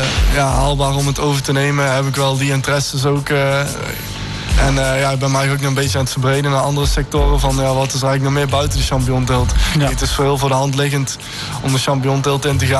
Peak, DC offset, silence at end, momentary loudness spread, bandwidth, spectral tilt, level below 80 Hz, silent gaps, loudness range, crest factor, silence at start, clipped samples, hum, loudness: -4 dBFS; under 0.1%; 0 s; 3 LU; 12.5 kHz; -5 dB/octave; -24 dBFS; none; 1 LU; 10 dB; 0 s; under 0.1%; none; -16 LUFS